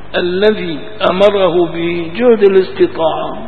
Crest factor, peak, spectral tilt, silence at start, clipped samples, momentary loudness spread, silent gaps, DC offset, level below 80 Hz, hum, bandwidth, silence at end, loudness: 12 dB; 0 dBFS; -7.5 dB/octave; 0.05 s; 0.1%; 8 LU; none; 5%; -44 dBFS; none; 6.2 kHz; 0 s; -12 LUFS